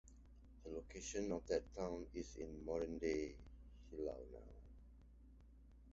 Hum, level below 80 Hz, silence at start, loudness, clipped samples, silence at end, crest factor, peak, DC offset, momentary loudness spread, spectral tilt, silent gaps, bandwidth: none; -60 dBFS; 0.05 s; -47 LUFS; under 0.1%; 0 s; 22 dB; -26 dBFS; under 0.1%; 23 LU; -5.5 dB/octave; none; 7.6 kHz